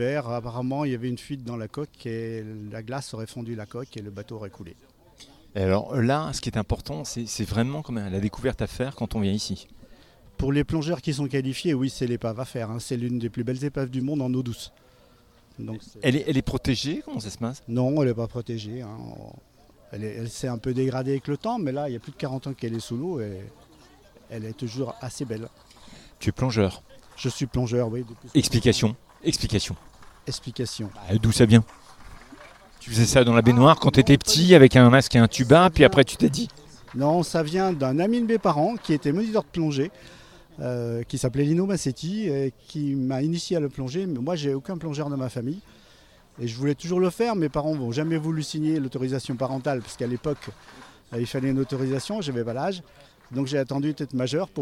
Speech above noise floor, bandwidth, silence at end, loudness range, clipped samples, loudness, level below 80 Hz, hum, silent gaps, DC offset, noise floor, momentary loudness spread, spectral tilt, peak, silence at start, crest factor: 32 dB; 15.5 kHz; 0 s; 14 LU; under 0.1%; -24 LUFS; -46 dBFS; none; none; under 0.1%; -56 dBFS; 18 LU; -6 dB/octave; 0 dBFS; 0 s; 24 dB